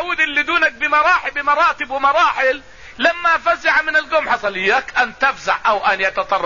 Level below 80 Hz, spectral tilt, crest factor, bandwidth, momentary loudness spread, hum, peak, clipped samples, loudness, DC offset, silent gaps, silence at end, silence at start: -50 dBFS; -2.5 dB/octave; 14 dB; 7.4 kHz; 4 LU; none; -4 dBFS; under 0.1%; -16 LUFS; 0.5%; none; 0 s; 0 s